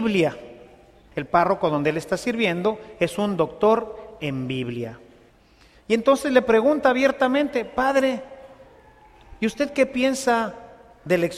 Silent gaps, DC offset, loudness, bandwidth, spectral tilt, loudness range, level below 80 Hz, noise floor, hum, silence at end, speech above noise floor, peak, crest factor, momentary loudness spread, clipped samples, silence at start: none; under 0.1%; -22 LUFS; 15 kHz; -5.5 dB/octave; 4 LU; -54 dBFS; -54 dBFS; none; 0 s; 33 dB; -4 dBFS; 20 dB; 14 LU; under 0.1%; 0 s